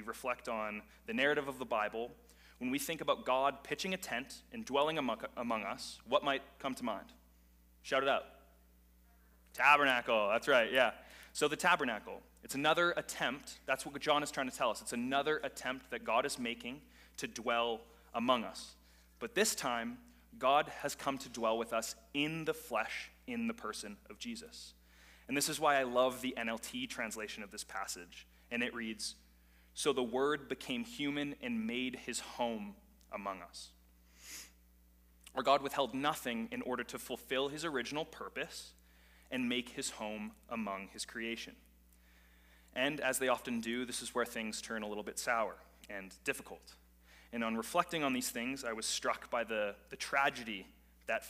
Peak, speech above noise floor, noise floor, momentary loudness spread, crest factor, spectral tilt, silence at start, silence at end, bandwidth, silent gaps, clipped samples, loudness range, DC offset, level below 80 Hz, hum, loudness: -14 dBFS; 28 dB; -65 dBFS; 15 LU; 24 dB; -2.5 dB/octave; 0 s; 0 s; 15.5 kHz; none; under 0.1%; 8 LU; under 0.1%; -66 dBFS; none; -36 LUFS